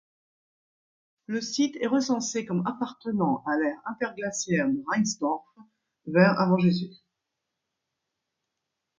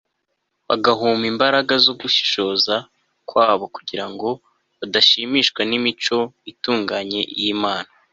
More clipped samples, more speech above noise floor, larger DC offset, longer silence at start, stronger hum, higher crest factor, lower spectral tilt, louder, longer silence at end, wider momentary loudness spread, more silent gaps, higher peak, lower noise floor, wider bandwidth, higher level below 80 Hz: neither; first, 58 dB vs 54 dB; neither; first, 1.3 s vs 0.7 s; neither; about the same, 22 dB vs 18 dB; first, -5 dB/octave vs -3.5 dB/octave; second, -27 LUFS vs -18 LUFS; first, 2.05 s vs 0.3 s; about the same, 11 LU vs 13 LU; neither; second, -6 dBFS vs -2 dBFS; first, -84 dBFS vs -74 dBFS; about the same, 7.6 kHz vs 7.8 kHz; second, -70 dBFS vs -64 dBFS